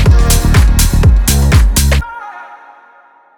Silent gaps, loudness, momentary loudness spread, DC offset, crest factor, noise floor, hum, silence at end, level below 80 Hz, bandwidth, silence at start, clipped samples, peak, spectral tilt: none; -10 LUFS; 17 LU; under 0.1%; 10 dB; -44 dBFS; none; 0.85 s; -12 dBFS; over 20 kHz; 0 s; under 0.1%; 0 dBFS; -4.5 dB/octave